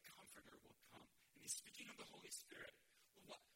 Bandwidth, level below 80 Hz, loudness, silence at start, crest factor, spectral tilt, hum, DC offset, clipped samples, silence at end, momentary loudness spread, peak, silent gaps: 16.5 kHz; -88 dBFS; -56 LUFS; 0 s; 26 dB; -0.5 dB/octave; none; under 0.1%; under 0.1%; 0 s; 17 LU; -34 dBFS; none